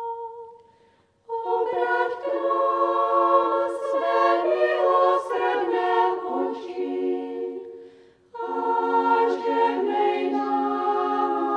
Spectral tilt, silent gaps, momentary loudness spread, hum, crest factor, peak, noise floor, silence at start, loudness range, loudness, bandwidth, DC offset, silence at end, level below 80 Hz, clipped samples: -4.5 dB/octave; none; 12 LU; none; 16 dB; -6 dBFS; -61 dBFS; 0 s; 5 LU; -23 LUFS; 10 kHz; under 0.1%; 0 s; -78 dBFS; under 0.1%